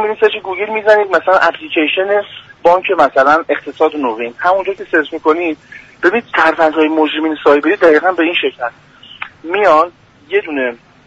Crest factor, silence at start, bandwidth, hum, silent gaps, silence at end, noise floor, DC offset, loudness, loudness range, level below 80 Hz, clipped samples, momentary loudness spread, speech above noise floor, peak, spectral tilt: 14 dB; 0 s; 8 kHz; none; none; 0.3 s; -32 dBFS; under 0.1%; -13 LUFS; 2 LU; -56 dBFS; under 0.1%; 9 LU; 19 dB; 0 dBFS; -4.5 dB/octave